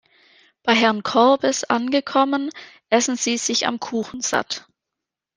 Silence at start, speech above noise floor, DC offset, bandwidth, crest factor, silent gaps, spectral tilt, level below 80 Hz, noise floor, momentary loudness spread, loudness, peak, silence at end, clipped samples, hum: 0.65 s; 64 dB; under 0.1%; 10.5 kHz; 20 dB; none; -2 dB/octave; -66 dBFS; -85 dBFS; 10 LU; -20 LUFS; -2 dBFS; 0.8 s; under 0.1%; none